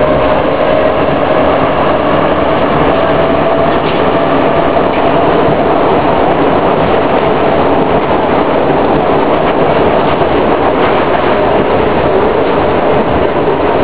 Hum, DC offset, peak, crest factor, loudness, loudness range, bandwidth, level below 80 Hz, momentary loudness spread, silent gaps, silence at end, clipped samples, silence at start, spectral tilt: none; 8%; 0 dBFS; 10 dB; -10 LUFS; 0 LU; 4 kHz; -28 dBFS; 1 LU; none; 0 s; 0.2%; 0 s; -10 dB/octave